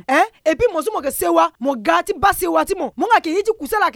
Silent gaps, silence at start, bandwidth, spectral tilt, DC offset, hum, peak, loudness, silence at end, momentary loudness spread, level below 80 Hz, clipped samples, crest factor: none; 0.1 s; 18 kHz; -3.5 dB/octave; under 0.1%; none; -2 dBFS; -18 LUFS; 0.05 s; 5 LU; -44 dBFS; under 0.1%; 16 dB